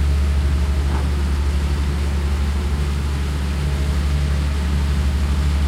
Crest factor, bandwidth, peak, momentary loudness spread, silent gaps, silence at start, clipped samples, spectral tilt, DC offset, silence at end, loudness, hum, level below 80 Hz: 10 dB; 12 kHz; -10 dBFS; 3 LU; none; 0 s; under 0.1%; -6 dB/octave; under 0.1%; 0 s; -21 LUFS; none; -20 dBFS